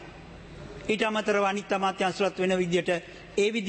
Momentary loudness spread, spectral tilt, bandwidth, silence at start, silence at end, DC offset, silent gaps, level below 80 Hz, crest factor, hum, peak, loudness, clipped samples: 19 LU; -4.5 dB/octave; 8.8 kHz; 0 s; 0 s; under 0.1%; none; -56 dBFS; 14 dB; none; -14 dBFS; -27 LUFS; under 0.1%